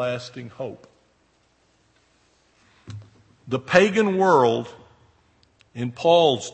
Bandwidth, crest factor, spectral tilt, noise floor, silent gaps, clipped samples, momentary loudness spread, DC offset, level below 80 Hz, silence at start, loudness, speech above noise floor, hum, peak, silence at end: 8.8 kHz; 24 dB; -5 dB/octave; -63 dBFS; none; under 0.1%; 24 LU; under 0.1%; -64 dBFS; 0 s; -20 LUFS; 43 dB; none; 0 dBFS; 0.05 s